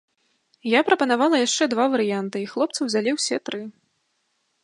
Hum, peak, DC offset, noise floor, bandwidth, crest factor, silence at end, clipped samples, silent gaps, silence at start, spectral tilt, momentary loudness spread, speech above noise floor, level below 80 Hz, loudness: none; -2 dBFS; under 0.1%; -71 dBFS; 11.5 kHz; 22 dB; 0.95 s; under 0.1%; none; 0.65 s; -3 dB/octave; 12 LU; 50 dB; -78 dBFS; -22 LUFS